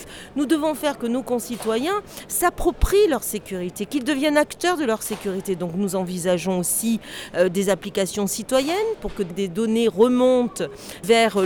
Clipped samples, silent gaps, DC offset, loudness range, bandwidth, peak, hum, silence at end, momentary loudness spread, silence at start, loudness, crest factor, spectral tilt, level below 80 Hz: under 0.1%; none; under 0.1%; 2 LU; over 20 kHz; -4 dBFS; none; 0 s; 10 LU; 0 s; -22 LUFS; 16 dB; -4 dB/octave; -38 dBFS